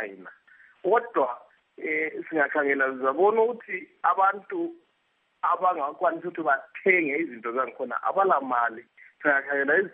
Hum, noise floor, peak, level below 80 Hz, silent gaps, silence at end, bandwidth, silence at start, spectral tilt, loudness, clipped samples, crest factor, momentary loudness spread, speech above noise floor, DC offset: none; -71 dBFS; -8 dBFS; -88 dBFS; none; 0.05 s; 3.8 kHz; 0 s; -8.5 dB/octave; -25 LUFS; under 0.1%; 18 dB; 11 LU; 46 dB; under 0.1%